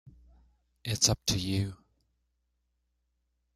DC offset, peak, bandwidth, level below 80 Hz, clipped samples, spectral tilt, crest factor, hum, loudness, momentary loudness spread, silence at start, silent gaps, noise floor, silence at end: under 0.1%; -8 dBFS; 16 kHz; -54 dBFS; under 0.1%; -3 dB/octave; 26 dB; none; -29 LUFS; 13 LU; 0.05 s; none; -78 dBFS; 1.8 s